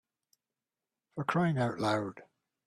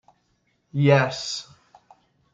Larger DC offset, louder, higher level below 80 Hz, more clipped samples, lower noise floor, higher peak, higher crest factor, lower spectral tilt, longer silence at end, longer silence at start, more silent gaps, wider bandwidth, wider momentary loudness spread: neither; second, -32 LUFS vs -22 LUFS; about the same, -70 dBFS vs -66 dBFS; neither; first, under -90 dBFS vs -69 dBFS; second, -14 dBFS vs -4 dBFS; about the same, 20 dB vs 20 dB; first, -7 dB/octave vs -5.5 dB/octave; second, 0.45 s vs 0.9 s; first, 1.15 s vs 0.75 s; neither; first, 12.5 kHz vs 7.8 kHz; about the same, 12 LU vs 14 LU